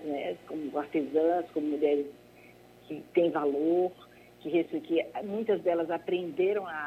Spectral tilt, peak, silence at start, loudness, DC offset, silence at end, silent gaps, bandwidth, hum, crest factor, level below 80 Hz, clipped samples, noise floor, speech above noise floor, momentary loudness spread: -7 dB/octave; -12 dBFS; 0 s; -30 LUFS; under 0.1%; 0 s; none; 12.5 kHz; 60 Hz at -60 dBFS; 18 dB; -72 dBFS; under 0.1%; -55 dBFS; 25 dB; 8 LU